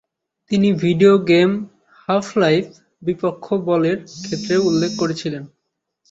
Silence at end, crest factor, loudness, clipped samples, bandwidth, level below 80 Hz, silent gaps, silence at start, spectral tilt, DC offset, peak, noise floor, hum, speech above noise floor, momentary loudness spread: 0.65 s; 18 dB; -18 LUFS; under 0.1%; 8 kHz; -58 dBFS; none; 0.5 s; -6 dB/octave; under 0.1%; -2 dBFS; -76 dBFS; none; 59 dB; 14 LU